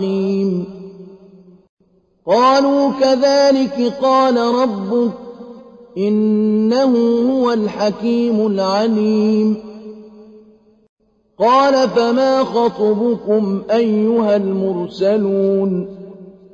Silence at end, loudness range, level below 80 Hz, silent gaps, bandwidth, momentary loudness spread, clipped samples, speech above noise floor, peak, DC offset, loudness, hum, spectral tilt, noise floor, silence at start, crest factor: 0.25 s; 3 LU; -58 dBFS; 1.69-1.77 s, 10.89-10.97 s; 7.4 kHz; 15 LU; under 0.1%; 42 dB; -4 dBFS; under 0.1%; -15 LUFS; none; -6.5 dB/octave; -57 dBFS; 0 s; 12 dB